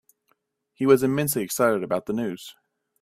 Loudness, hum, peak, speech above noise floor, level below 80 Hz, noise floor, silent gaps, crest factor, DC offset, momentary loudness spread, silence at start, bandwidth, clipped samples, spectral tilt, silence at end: -23 LUFS; none; -4 dBFS; 48 dB; -66 dBFS; -71 dBFS; none; 20 dB; under 0.1%; 13 LU; 0.8 s; 16 kHz; under 0.1%; -5 dB/octave; 0.5 s